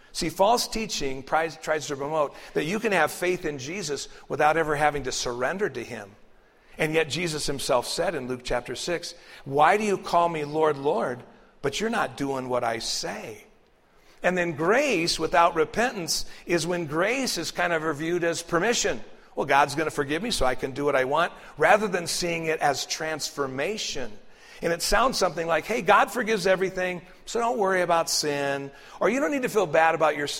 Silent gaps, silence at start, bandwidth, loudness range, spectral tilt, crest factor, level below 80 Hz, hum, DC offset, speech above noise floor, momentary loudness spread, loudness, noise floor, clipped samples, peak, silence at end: none; 0.15 s; 16 kHz; 4 LU; -3.5 dB/octave; 20 dB; -48 dBFS; none; under 0.1%; 33 dB; 10 LU; -25 LUFS; -58 dBFS; under 0.1%; -6 dBFS; 0 s